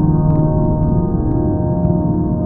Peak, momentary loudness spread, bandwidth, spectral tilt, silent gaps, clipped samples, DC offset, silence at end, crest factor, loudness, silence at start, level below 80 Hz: -2 dBFS; 3 LU; 1.8 kHz; -15 dB/octave; none; under 0.1%; under 0.1%; 0 s; 12 dB; -16 LUFS; 0 s; -24 dBFS